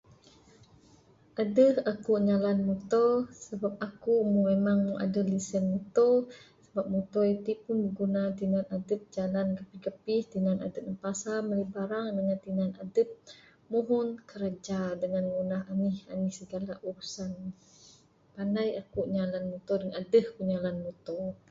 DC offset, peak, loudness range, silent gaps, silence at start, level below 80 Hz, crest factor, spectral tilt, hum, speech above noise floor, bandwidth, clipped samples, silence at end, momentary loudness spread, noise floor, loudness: under 0.1%; -12 dBFS; 7 LU; none; 1.35 s; -66 dBFS; 18 dB; -7 dB/octave; none; 31 dB; 7.8 kHz; under 0.1%; 0.15 s; 12 LU; -60 dBFS; -31 LUFS